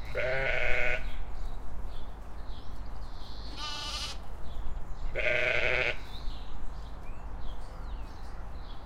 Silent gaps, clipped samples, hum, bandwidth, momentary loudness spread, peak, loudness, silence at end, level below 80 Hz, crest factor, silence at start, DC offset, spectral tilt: none; under 0.1%; none; 9.8 kHz; 18 LU; -10 dBFS; -33 LUFS; 0 s; -38 dBFS; 18 dB; 0 s; under 0.1%; -4 dB/octave